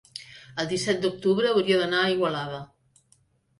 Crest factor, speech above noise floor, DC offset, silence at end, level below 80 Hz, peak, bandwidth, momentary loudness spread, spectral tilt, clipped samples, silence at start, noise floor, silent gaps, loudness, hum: 18 dB; 40 dB; under 0.1%; 0.95 s; -64 dBFS; -10 dBFS; 11.5 kHz; 16 LU; -4.5 dB/octave; under 0.1%; 0.15 s; -65 dBFS; none; -25 LUFS; none